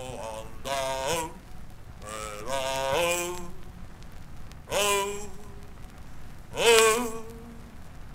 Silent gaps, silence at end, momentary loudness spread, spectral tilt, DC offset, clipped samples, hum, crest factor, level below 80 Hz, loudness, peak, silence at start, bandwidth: none; 0 s; 25 LU; -2 dB/octave; under 0.1%; under 0.1%; none; 30 dB; -46 dBFS; -26 LUFS; 0 dBFS; 0 s; 16 kHz